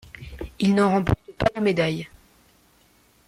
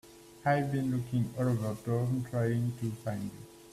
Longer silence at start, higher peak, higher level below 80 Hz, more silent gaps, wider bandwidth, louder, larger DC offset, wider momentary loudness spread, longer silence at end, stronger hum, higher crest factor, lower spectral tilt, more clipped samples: about the same, 0.15 s vs 0.05 s; first, -8 dBFS vs -16 dBFS; first, -44 dBFS vs -62 dBFS; neither; about the same, 14 kHz vs 14.5 kHz; first, -23 LUFS vs -33 LUFS; neither; first, 19 LU vs 8 LU; first, 1.2 s vs 0 s; neither; about the same, 18 dB vs 18 dB; about the same, -7 dB/octave vs -8 dB/octave; neither